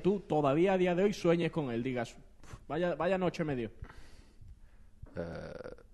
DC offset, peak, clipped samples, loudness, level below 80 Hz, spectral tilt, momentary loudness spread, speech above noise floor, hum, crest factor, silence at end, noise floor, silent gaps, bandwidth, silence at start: under 0.1%; -16 dBFS; under 0.1%; -32 LUFS; -56 dBFS; -7 dB/octave; 18 LU; 23 dB; none; 18 dB; 0.1 s; -55 dBFS; none; 12 kHz; 0 s